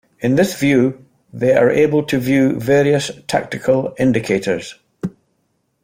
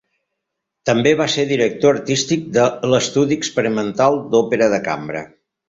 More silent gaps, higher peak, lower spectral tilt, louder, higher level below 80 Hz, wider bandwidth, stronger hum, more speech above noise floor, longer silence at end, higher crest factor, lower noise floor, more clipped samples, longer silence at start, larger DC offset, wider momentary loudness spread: neither; about the same, -2 dBFS vs -2 dBFS; first, -6 dB/octave vs -4.5 dB/octave; about the same, -16 LUFS vs -17 LUFS; about the same, -52 dBFS vs -56 dBFS; first, 16.5 kHz vs 8 kHz; neither; second, 51 dB vs 62 dB; first, 0.75 s vs 0.4 s; about the same, 14 dB vs 16 dB; second, -66 dBFS vs -79 dBFS; neither; second, 0.2 s vs 0.85 s; neither; first, 11 LU vs 7 LU